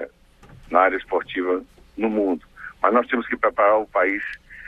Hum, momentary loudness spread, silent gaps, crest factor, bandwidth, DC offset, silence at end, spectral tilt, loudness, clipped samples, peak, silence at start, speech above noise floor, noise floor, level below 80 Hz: none; 11 LU; none; 20 dB; 7.6 kHz; under 0.1%; 0 s; -6.5 dB/octave; -21 LUFS; under 0.1%; -2 dBFS; 0 s; 28 dB; -49 dBFS; -54 dBFS